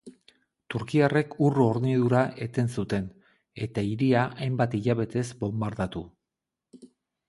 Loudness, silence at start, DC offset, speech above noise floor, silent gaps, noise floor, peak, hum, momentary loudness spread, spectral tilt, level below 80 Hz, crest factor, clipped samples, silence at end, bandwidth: -27 LUFS; 0.05 s; under 0.1%; 61 dB; none; -87 dBFS; -8 dBFS; none; 11 LU; -7.5 dB/octave; -56 dBFS; 20 dB; under 0.1%; 1.2 s; 11.5 kHz